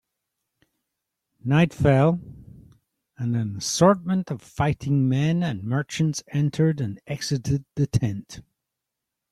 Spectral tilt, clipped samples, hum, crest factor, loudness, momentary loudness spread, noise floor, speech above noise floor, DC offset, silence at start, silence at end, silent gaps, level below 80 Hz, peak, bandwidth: -6 dB/octave; under 0.1%; none; 20 dB; -23 LUFS; 12 LU; -84 dBFS; 62 dB; under 0.1%; 1.45 s; 0.9 s; none; -50 dBFS; -6 dBFS; 13.5 kHz